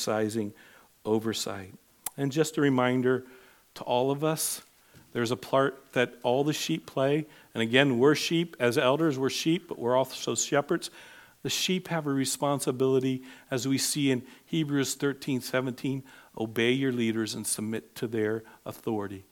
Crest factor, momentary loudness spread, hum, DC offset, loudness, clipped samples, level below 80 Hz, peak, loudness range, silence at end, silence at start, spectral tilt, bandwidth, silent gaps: 24 dB; 11 LU; none; under 0.1%; -28 LUFS; under 0.1%; -74 dBFS; -6 dBFS; 4 LU; 0.1 s; 0 s; -4.5 dB/octave; 19 kHz; none